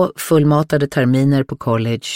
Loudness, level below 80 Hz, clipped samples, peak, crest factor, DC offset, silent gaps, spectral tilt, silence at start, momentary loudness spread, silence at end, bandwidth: -16 LUFS; -50 dBFS; under 0.1%; -4 dBFS; 12 dB; 0.3%; none; -6.5 dB/octave; 0 s; 5 LU; 0 s; 16.5 kHz